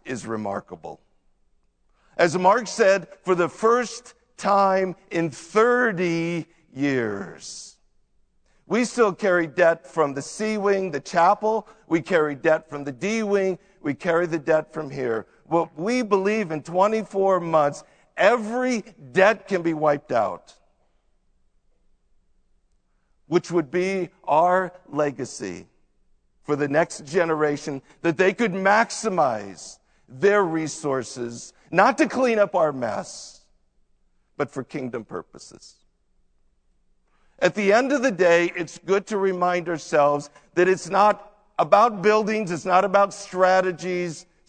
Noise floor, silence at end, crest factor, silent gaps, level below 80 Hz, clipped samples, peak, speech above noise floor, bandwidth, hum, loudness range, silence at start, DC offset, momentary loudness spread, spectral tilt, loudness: -65 dBFS; 0.3 s; 22 dB; none; -64 dBFS; under 0.1%; 0 dBFS; 43 dB; 9.4 kHz; none; 7 LU; 0.05 s; under 0.1%; 13 LU; -5 dB/octave; -22 LUFS